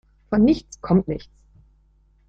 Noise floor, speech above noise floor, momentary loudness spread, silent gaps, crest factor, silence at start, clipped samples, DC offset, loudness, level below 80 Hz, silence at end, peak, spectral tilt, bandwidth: -58 dBFS; 38 dB; 12 LU; none; 18 dB; 0.3 s; under 0.1%; under 0.1%; -21 LUFS; -44 dBFS; 1.1 s; -6 dBFS; -8 dB/octave; 7.8 kHz